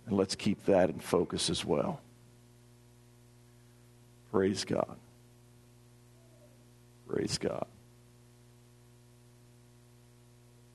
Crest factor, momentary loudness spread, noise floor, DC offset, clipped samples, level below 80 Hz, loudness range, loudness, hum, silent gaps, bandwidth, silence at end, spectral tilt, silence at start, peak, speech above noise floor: 24 dB; 11 LU; -59 dBFS; under 0.1%; under 0.1%; -66 dBFS; 8 LU; -32 LUFS; 60 Hz at -60 dBFS; none; 12 kHz; 3.1 s; -5 dB/octave; 0.05 s; -12 dBFS; 28 dB